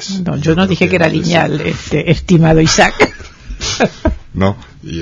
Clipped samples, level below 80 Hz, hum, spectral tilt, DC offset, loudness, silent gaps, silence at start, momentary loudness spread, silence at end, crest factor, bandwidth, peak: 0.3%; -28 dBFS; none; -5 dB/octave; under 0.1%; -13 LUFS; none; 0 s; 11 LU; 0 s; 12 dB; 7.6 kHz; 0 dBFS